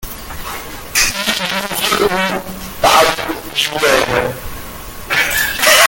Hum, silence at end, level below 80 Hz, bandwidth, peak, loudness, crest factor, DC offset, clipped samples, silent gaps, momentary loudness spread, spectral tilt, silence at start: none; 0 s; -36 dBFS; over 20 kHz; 0 dBFS; -14 LUFS; 16 dB; under 0.1%; under 0.1%; none; 16 LU; -1.5 dB/octave; 0 s